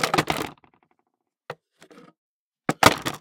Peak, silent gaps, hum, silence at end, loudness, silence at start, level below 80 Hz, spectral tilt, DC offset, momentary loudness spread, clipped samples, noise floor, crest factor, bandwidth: 0 dBFS; 2.18-2.51 s; none; 0.05 s; -22 LUFS; 0 s; -54 dBFS; -3.5 dB/octave; under 0.1%; 24 LU; under 0.1%; -75 dBFS; 26 dB; 18 kHz